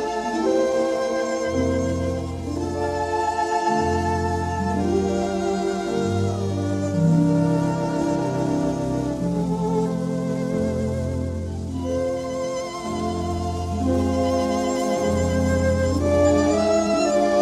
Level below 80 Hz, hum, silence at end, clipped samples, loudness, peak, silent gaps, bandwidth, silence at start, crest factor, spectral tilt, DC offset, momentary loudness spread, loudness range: -40 dBFS; none; 0 s; under 0.1%; -23 LUFS; -6 dBFS; none; 13 kHz; 0 s; 16 dB; -6.5 dB/octave; under 0.1%; 7 LU; 5 LU